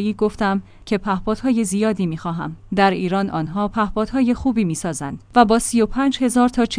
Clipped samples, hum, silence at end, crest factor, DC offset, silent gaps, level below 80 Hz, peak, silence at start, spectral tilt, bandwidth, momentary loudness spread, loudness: under 0.1%; none; 0 s; 18 dB; under 0.1%; none; -40 dBFS; 0 dBFS; 0 s; -5.5 dB/octave; 10.5 kHz; 8 LU; -20 LUFS